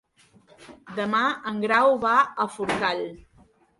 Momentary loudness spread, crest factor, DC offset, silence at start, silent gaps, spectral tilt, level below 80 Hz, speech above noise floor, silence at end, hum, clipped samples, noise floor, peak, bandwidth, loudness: 12 LU; 20 dB; under 0.1%; 0.6 s; none; -4.5 dB/octave; -62 dBFS; 35 dB; 0.6 s; none; under 0.1%; -58 dBFS; -6 dBFS; 11.5 kHz; -23 LUFS